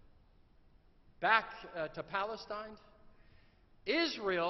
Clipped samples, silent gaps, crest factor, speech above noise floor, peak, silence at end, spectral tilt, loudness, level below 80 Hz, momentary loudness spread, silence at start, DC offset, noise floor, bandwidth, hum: under 0.1%; none; 26 dB; 29 dB; -12 dBFS; 0 s; -1 dB/octave; -35 LUFS; -66 dBFS; 15 LU; 1.2 s; under 0.1%; -64 dBFS; 6.2 kHz; none